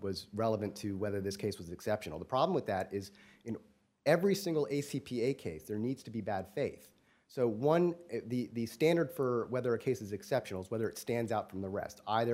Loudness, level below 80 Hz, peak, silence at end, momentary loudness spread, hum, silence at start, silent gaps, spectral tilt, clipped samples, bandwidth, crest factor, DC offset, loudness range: -35 LUFS; -70 dBFS; -14 dBFS; 0 s; 10 LU; none; 0 s; none; -6 dB/octave; under 0.1%; 16 kHz; 22 dB; under 0.1%; 3 LU